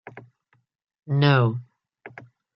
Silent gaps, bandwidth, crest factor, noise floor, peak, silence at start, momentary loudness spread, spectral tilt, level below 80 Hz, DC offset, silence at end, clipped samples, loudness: none; 5.8 kHz; 22 dB; -65 dBFS; -4 dBFS; 0.15 s; 26 LU; -9.5 dB/octave; -66 dBFS; under 0.1%; 0.5 s; under 0.1%; -21 LUFS